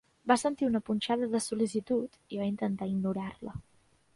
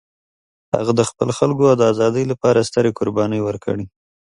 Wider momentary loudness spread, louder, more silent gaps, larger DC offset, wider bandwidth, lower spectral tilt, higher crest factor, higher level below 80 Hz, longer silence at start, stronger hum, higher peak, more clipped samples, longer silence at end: about the same, 12 LU vs 10 LU; second, -31 LUFS vs -18 LUFS; neither; neither; about the same, 11.5 kHz vs 11.5 kHz; about the same, -5.5 dB/octave vs -6 dB/octave; about the same, 20 dB vs 18 dB; second, -62 dBFS vs -52 dBFS; second, 0.25 s vs 0.75 s; neither; second, -12 dBFS vs 0 dBFS; neither; about the same, 0.55 s vs 0.45 s